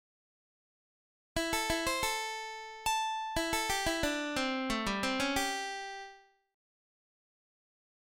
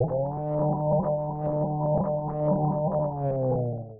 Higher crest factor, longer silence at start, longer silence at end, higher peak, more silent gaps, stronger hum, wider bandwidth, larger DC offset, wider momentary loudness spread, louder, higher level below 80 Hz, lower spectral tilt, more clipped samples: first, 20 dB vs 14 dB; first, 1.35 s vs 0 s; first, 1.85 s vs 0 s; second, -18 dBFS vs -12 dBFS; neither; neither; first, 17 kHz vs 2.1 kHz; neither; first, 9 LU vs 4 LU; second, -33 LUFS vs -27 LUFS; about the same, -54 dBFS vs -50 dBFS; second, -2.5 dB/octave vs -15 dB/octave; neither